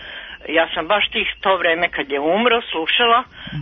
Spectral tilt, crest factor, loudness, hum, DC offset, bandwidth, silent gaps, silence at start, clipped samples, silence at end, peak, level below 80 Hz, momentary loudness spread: -7 dB/octave; 16 dB; -17 LUFS; none; under 0.1%; 5.6 kHz; none; 0 s; under 0.1%; 0 s; -2 dBFS; -50 dBFS; 6 LU